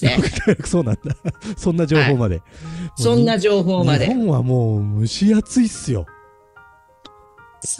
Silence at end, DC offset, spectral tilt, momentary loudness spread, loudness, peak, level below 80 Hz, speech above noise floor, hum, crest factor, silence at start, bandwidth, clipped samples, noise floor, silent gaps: 0 s; under 0.1%; -6 dB/octave; 12 LU; -18 LUFS; -2 dBFS; -40 dBFS; 31 dB; none; 16 dB; 0 s; 12.5 kHz; under 0.1%; -48 dBFS; none